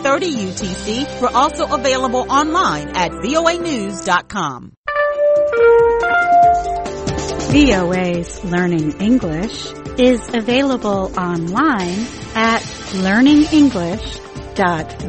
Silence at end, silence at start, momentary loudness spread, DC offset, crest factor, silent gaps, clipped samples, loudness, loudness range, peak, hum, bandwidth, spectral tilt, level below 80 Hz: 0 s; 0 s; 11 LU; under 0.1%; 14 dB; 4.77-4.84 s; under 0.1%; -16 LUFS; 3 LU; 0 dBFS; none; 8.8 kHz; -5 dB/octave; -36 dBFS